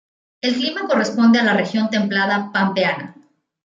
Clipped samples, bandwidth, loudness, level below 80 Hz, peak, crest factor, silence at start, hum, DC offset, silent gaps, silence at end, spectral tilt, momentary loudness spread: under 0.1%; 7.6 kHz; -18 LUFS; -68 dBFS; -4 dBFS; 14 dB; 0.45 s; none; under 0.1%; none; 0.55 s; -5 dB/octave; 8 LU